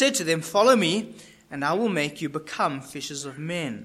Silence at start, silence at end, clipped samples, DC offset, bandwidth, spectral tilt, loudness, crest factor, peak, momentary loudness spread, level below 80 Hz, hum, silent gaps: 0 s; 0 s; under 0.1%; under 0.1%; 15.5 kHz; -4 dB/octave; -25 LUFS; 20 dB; -6 dBFS; 14 LU; -66 dBFS; none; none